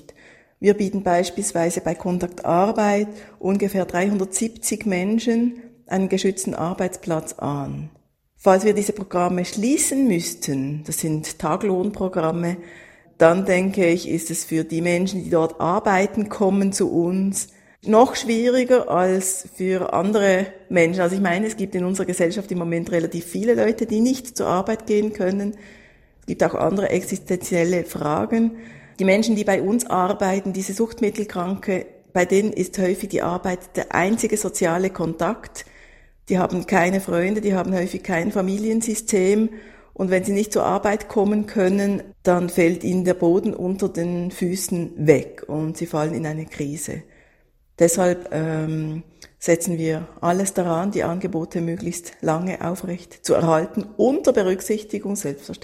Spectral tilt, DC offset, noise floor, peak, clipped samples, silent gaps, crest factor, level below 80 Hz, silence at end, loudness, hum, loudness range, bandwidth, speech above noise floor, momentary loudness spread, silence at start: -5.5 dB/octave; under 0.1%; -58 dBFS; 0 dBFS; under 0.1%; none; 22 dB; -52 dBFS; 0.05 s; -21 LUFS; none; 4 LU; 16 kHz; 38 dB; 9 LU; 0.6 s